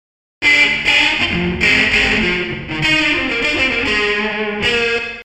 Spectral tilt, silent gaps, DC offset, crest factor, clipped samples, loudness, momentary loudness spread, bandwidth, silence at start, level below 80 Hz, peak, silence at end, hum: -3.5 dB/octave; none; under 0.1%; 16 dB; under 0.1%; -13 LUFS; 7 LU; 15.5 kHz; 0.4 s; -36 dBFS; 0 dBFS; 0 s; none